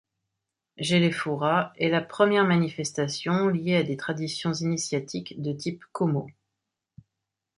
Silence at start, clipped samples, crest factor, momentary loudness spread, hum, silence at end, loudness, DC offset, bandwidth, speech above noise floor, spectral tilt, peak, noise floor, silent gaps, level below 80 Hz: 0.8 s; under 0.1%; 20 dB; 10 LU; none; 1.25 s; -26 LUFS; under 0.1%; 11 kHz; 59 dB; -5.5 dB/octave; -6 dBFS; -85 dBFS; none; -68 dBFS